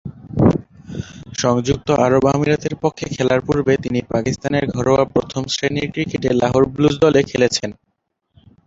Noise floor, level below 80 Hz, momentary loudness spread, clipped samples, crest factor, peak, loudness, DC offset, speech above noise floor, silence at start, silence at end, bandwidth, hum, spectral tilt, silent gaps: -59 dBFS; -42 dBFS; 9 LU; under 0.1%; 16 dB; -2 dBFS; -18 LUFS; under 0.1%; 42 dB; 0.05 s; 0.95 s; 7.8 kHz; none; -5.5 dB/octave; none